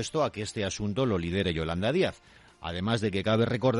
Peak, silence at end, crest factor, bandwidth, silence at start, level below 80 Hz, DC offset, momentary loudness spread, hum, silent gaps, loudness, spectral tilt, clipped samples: -14 dBFS; 0 s; 14 dB; 11.5 kHz; 0 s; -54 dBFS; under 0.1%; 6 LU; none; none; -29 LUFS; -5.5 dB/octave; under 0.1%